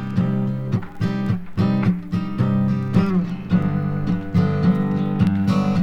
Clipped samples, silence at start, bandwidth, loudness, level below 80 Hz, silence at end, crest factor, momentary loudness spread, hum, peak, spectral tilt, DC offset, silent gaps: under 0.1%; 0 s; 6.8 kHz; -21 LUFS; -42 dBFS; 0 s; 14 dB; 5 LU; none; -4 dBFS; -9 dB/octave; under 0.1%; none